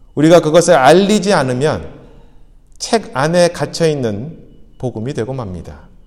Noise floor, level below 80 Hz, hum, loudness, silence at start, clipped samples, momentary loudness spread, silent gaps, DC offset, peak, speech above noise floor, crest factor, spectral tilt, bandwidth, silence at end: -41 dBFS; -42 dBFS; none; -13 LUFS; 0.15 s; under 0.1%; 17 LU; none; under 0.1%; 0 dBFS; 28 dB; 14 dB; -5 dB/octave; 15.5 kHz; 0.25 s